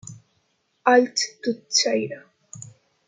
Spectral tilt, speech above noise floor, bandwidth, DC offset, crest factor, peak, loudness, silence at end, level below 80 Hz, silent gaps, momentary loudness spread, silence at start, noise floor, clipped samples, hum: -2 dB/octave; 48 dB; 9.6 kHz; under 0.1%; 22 dB; -4 dBFS; -21 LUFS; 0.45 s; -74 dBFS; none; 23 LU; 0.1 s; -69 dBFS; under 0.1%; none